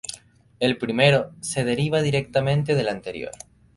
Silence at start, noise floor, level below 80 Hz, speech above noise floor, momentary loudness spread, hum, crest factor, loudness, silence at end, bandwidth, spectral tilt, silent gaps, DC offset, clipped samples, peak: 0.1 s; -47 dBFS; -54 dBFS; 24 dB; 17 LU; none; 20 dB; -22 LUFS; 0.45 s; 11.5 kHz; -5 dB/octave; none; under 0.1%; under 0.1%; -2 dBFS